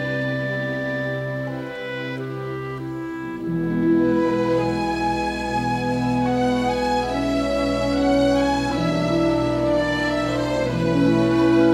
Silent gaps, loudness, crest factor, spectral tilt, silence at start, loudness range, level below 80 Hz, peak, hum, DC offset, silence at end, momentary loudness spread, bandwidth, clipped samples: none; -22 LUFS; 16 dB; -6.5 dB/octave; 0 s; 6 LU; -40 dBFS; -6 dBFS; none; under 0.1%; 0 s; 11 LU; 12.5 kHz; under 0.1%